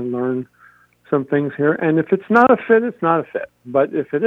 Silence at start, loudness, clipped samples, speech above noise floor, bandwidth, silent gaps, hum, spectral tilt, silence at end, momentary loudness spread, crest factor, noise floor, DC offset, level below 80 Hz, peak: 0 s; -18 LUFS; under 0.1%; 34 dB; 6 kHz; none; 60 Hz at -50 dBFS; -9 dB/octave; 0 s; 12 LU; 18 dB; -51 dBFS; under 0.1%; -64 dBFS; 0 dBFS